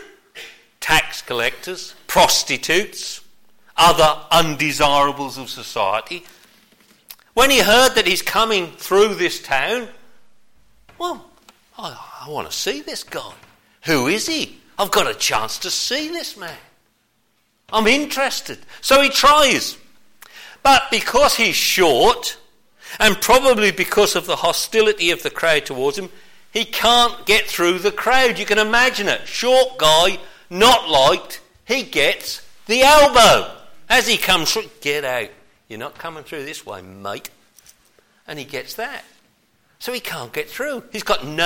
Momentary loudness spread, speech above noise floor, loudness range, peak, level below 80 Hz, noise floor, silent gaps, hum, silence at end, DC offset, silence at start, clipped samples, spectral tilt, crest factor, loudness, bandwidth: 19 LU; 47 dB; 14 LU; -2 dBFS; -42 dBFS; -65 dBFS; none; none; 0 s; under 0.1%; 0 s; under 0.1%; -2 dB/octave; 16 dB; -16 LUFS; 17 kHz